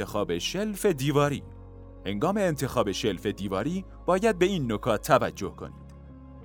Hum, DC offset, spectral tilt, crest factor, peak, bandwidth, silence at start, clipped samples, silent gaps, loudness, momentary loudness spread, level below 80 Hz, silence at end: none; under 0.1%; -5.5 dB/octave; 22 dB; -6 dBFS; 19.5 kHz; 0 s; under 0.1%; none; -27 LUFS; 22 LU; -48 dBFS; 0 s